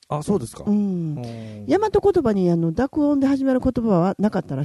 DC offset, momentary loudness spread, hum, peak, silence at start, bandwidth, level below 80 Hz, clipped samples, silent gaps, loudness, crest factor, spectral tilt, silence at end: under 0.1%; 8 LU; none; -6 dBFS; 0.1 s; 12 kHz; -44 dBFS; under 0.1%; none; -21 LUFS; 14 dB; -8 dB/octave; 0 s